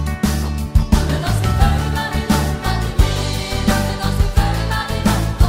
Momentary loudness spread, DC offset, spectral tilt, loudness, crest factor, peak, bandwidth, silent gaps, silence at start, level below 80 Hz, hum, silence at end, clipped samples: 4 LU; under 0.1%; -5.5 dB/octave; -18 LUFS; 16 dB; 0 dBFS; 16.5 kHz; none; 0 s; -20 dBFS; none; 0 s; under 0.1%